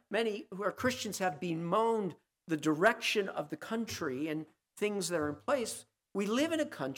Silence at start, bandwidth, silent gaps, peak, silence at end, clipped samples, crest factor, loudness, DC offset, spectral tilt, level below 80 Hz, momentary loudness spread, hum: 0.1 s; 17.5 kHz; none; -14 dBFS; 0 s; under 0.1%; 20 dB; -34 LUFS; under 0.1%; -4 dB/octave; -74 dBFS; 11 LU; none